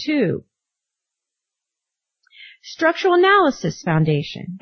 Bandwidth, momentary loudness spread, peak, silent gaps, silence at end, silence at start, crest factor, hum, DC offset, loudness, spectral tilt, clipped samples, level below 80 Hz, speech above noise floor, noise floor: 6.6 kHz; 16 LU; -4 dBFS; none; 0.05 s; 0 s; 16 dB; none; under 0.1%; -18 LUFS; -6 dB/octave; under 0.1%; -60 dBFS; 65 dB; -83 dBFS